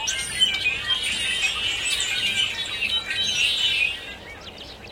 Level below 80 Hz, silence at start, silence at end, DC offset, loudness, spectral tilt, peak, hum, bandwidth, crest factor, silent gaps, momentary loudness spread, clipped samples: -50 dBFS; 0 s; 0 s; under 0.1%; -21 LUFS; 0.5 dB/octave; -8 dBFS; none; 16.5 kHz; 16 dB; none; 17 LU; under 0.1%